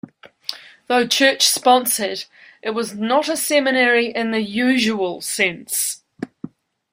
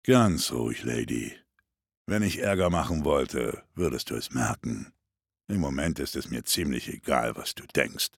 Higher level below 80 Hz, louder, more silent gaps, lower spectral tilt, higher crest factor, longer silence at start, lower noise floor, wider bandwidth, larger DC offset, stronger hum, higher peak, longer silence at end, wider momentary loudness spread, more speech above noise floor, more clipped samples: second, -66 dBFS vs -48 dBFS; first, -18 LUFS vs -28 LUFS; second, none vs 1.97-2.05 s; second, -2 dB/octave vs -4.5 dB/octave; about the same, 18 dB vs 22 dB; first, 0.25 s vs 0.05 s; second, -38 dBFS vs -87 dBFS; second, 16 kHz vs 18 kHz; neither; neither; first, -2 dBFS vs -6 dBFS; first, 0.45 s vs 0.1 s; first, 18 LU vs 9 LU; second, 19 dB vs 60 dB; neither